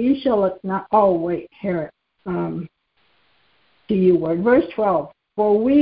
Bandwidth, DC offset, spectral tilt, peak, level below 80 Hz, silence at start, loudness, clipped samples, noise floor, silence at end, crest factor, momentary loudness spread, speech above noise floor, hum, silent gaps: 5.2 kHz; under 0.1%; -12.5 dB/octave; -2 dBFS; -54 dBFS; 0 s; -20 LUFS; under 0.1%; -63 dBFS; 0 s; 16 dB; 13 LU; 45 dB; none; none